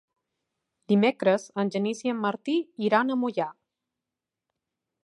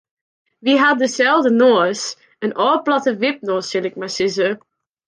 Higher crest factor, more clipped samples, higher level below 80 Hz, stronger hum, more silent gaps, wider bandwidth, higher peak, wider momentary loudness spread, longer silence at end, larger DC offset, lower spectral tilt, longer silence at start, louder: first, 20 dB vs 14 dB; neither; second, -82 dBFS vs -68 dBFS; neither; neither; about the same, 11 kHz vs 10 kHz; second, -8 dBFS vs -4 dBFS; second, 6 LU vs 12 LU; first, 1.5 s vs 0.5 s; neither; first, -6 dB/octave vs -3.5 dB/octave; first, 0.9 s vs 0.65 s; second, -26 LUFS vs -17 LUFS